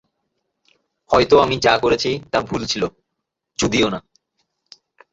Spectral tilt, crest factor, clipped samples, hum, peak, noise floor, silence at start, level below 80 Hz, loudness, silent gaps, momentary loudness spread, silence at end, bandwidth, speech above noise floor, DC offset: -4 dB/octave; 20 dB; under 0.1%; none; 0 dBFS; -79 dBFS; 1.1 s; -46 dBFS; -18 LUFS; none; 10 LU; 1.15 s; 8 kHz; 62 dB; under 0.1%